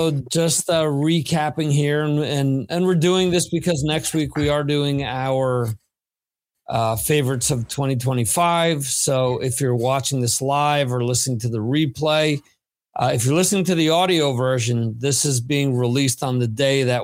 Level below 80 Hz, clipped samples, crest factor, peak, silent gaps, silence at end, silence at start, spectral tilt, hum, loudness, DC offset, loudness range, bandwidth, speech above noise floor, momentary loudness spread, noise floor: -50 dBFS; under 0.1%; 14 dB; -6 dBFS; none; 0 s; 0 s; -4.5 dB/octave; none; -20 LUFS; under 0.1%; 3 LU; 16.5 kHz; over 70 dB; 5 LU; under -90 dBFS